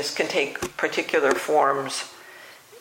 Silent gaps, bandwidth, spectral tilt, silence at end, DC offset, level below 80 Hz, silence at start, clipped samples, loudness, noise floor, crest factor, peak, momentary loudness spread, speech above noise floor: none; 16.5 kHz; -2.5 dB/octave; 0 s; under 0.1%; -62 dBFS; 0 s; under 0.1%; -23 LUFS; -46 dBFS; 20 dB; -6 dBFS; 20 LU; 22 dB